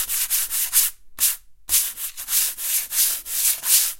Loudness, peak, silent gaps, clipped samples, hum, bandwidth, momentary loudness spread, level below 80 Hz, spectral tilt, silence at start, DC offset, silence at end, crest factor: -19 LUFS; -2 dBFS; none; under 0.1%; none; 16.5 kHz; 6 LU; -54 dBFS; 4 dB/octave; 0 s; under 0.1%; 0 s; 22 dB